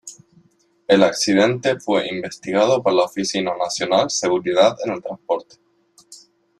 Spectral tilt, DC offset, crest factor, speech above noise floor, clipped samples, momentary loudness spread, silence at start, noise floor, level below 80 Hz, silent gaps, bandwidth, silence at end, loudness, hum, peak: -4 dB/octave; under 0.1%; 18 dB; 40 dB; under 0.1%; 10 LU; 0.05 s; -58 dBFS; -62 dBFS; none; 12.5 kHz; 0.45 s; -19 LUFS; none; -2 dBFS